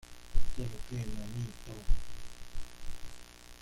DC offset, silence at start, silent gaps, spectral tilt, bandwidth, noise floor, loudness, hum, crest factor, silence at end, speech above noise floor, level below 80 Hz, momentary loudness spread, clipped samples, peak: under 0.1%; 0.1 s; none; -5.5 dB/octave; 11.5 kHz; -48 dBFS; -43 LUFS; none; 16 dB; 0.1 s; 18 dB; -36 dBFS; 11 LU; under 0.1%; -14 dBFS